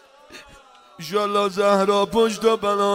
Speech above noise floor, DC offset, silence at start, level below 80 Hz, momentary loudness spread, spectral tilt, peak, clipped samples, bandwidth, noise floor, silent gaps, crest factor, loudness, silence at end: 29 dB; under 0.1%; 0.3 s; -56 dBFS; 6 LU; -4.5 dB/octave; -4 dBFS; under 0.1%; 16 kHz; -48 dBFS; none; 18 dB; -20 LUFS; 0 s